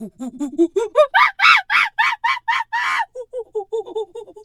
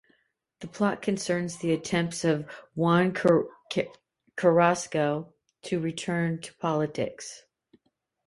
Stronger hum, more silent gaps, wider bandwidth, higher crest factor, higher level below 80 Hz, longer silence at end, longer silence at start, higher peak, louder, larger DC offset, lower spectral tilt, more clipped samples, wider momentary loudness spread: neither; neither; first, 14 kHz vs 11.5 kHz; about the same, 18 dB vs 20 dB; about the same, -64 dBFS vs -66 dBFS; second, 0 s vs 0.9 s; second, 0 s vs 0.6 s; first, 0 dBFS vs -8 dBFS; first, -17 LUFS vs -27 LUFS; neither; second, -2 dB/octave vs -5.5 dB/octave; neither; about the same, 16 LU vs 18 LU